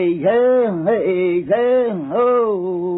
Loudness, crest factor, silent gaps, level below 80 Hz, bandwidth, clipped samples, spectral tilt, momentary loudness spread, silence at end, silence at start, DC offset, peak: -17 LUFS; 12 dB; none; -58 dBFS; 4 kHz; under 0.1%; -11.5 dB/octave; 4 LU; 0 s; 0 s; under 0.1%; -6 dBFS